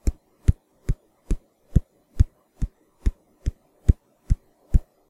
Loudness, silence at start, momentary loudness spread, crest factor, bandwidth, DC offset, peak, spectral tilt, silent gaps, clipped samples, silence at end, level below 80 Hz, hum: -29 LUFS; 0.05 s; 10 LU; 24 dB; 11.5 kHz; under 0.1%; -2 dBFS; -8.5 dB/octave; none; under 0.1%; 0.3 s; -26 dBFS; none